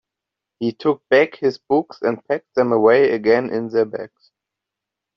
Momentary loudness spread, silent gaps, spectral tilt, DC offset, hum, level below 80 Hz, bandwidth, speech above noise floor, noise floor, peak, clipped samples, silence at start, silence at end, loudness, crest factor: 11 LU; none; -4.5 dB/octave; under 0.1%; none; -64 dBFS; 6.2 kHz; 66 dB; -84 dBFS; -2 dBFS; under 0.1%; 0.6 s; 1.1 s; -18 LUFS; 16 dB